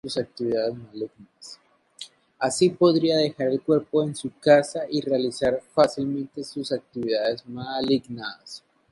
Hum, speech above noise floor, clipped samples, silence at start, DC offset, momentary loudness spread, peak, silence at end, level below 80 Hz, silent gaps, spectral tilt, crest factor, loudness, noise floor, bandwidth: none; 27 dB; under 0.1%; 0.05 s; under 0.1%; 23 LU; -4 dBFS; 0.35 s; -62 dBFS; none; -5 dB/octave; 20 dB; -24 LUFS; -51 dBFS; 11.5 kHz